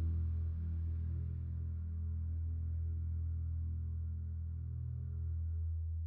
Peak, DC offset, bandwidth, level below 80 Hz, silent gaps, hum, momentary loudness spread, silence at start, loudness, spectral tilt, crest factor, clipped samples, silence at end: -28 dBFS; under 0.1%; 1.5 kHz; -46 dBFS; none; none; 3 LU; 0 s; -41 LUFS; -13 dB/octave; 10 dB; under 0.1%; 0 s